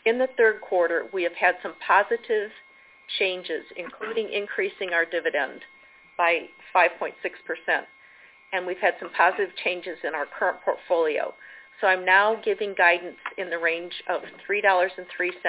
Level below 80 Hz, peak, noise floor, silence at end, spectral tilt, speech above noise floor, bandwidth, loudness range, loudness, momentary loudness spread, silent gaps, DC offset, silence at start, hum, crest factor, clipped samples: -74 dBFS; -6 dBFS; -52 dBFS; 0 s; -6 dB/octave; 28 dB; 4 kHz; 4 LU; -24 LUFS; 12 LU; none; under 0.1%; 0.05 s; none; 20 dB; under 0.1%